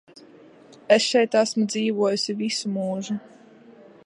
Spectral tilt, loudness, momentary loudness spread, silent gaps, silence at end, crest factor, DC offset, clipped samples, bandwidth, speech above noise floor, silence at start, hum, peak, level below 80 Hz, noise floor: -4 dB/octave; -23 LUFS; 10 LU; none; 0.35 s; 22 dB; under 0.1%; under 0.1%; 11.5 kHz; 27 dB; 0.9 s; none; -2 dBFS; -76 dBFS; -49 dBFS